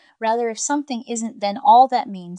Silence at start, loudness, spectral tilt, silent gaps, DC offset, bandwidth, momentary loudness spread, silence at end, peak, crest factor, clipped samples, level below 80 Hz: 0.2 s; -19 LUFS; -3.5 dB/octave; none; under 0.1%; 10.5 kHz; 13 LU; 0 s; -2 dBFS; 16 dB; under 0.1%; -82 dBFS